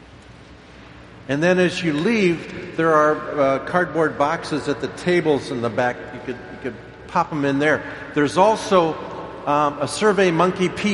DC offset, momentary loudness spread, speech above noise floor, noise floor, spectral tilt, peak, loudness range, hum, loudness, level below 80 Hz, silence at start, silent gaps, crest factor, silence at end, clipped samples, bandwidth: under 0.1%; 14 LU; 24 dB; -43 dBFS; -5.5 dB/octave; -2 dBFS; 4 LU; none; -20 LUFS; -52 dBFS; 0 s; none; 20 dB; 0 s; under 0.1%; 11.5 kHz